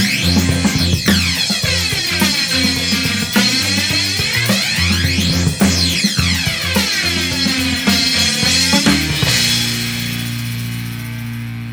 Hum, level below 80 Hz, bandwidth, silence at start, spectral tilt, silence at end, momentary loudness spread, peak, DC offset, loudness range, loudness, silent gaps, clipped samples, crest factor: none; -34 dBFS; over 20 kHz; 0 s; -3 dB/octave; 0 s; 9 LU; 0 dBFS; under 0.1%; 1 LU; -14 LUFS; none; under 0.1%; 16 dB